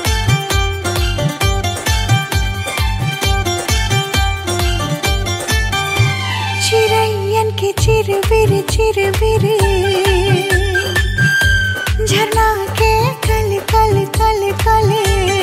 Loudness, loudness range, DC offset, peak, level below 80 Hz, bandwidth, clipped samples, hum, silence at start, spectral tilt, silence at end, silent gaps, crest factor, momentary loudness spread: -15 LUFS; 3 LU; under 0.1%; -2 dBFS; -22 dBFS; 16.5 kHz; under 0.1%; none; 0 s; -4.5 dB/octave; 0 s; none; 12 dB; 5 LU